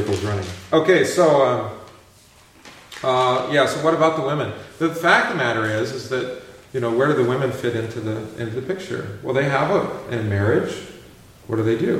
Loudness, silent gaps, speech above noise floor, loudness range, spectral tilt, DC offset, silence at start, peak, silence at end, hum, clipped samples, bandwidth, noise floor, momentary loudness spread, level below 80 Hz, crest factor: -20 LUFS; none; 30 dB; 4 LU; -5.5 dB/octave; under 0.1%; 0 s; -2 dBFS; 0 s; none; under 0.1%; 16 kHz; -50 dBFS; 13 LU; -56 dBFS; 18 dB